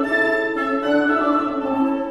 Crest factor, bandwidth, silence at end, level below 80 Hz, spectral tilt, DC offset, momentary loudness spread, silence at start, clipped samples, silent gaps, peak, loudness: 12 dB; 11 kHz; 0 s; -52 dBFS; -5.5 dB/octave; under 0.1%; 3 LU; 0 s; under 0.1%; none; -6 dBFS; -19 LUFS